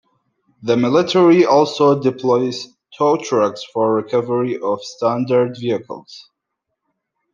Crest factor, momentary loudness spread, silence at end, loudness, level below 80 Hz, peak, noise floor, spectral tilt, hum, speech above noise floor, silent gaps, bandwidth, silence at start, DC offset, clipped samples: 16 dB; 12 LU; 1.15 s; -17 LUFS; -66 dBFS; -2 dBFS; -77 dBFS; -6 dB/octave; none; 61 dB; none; 7.4 kHz; 0.6 s; under 0.1%; under 0.1%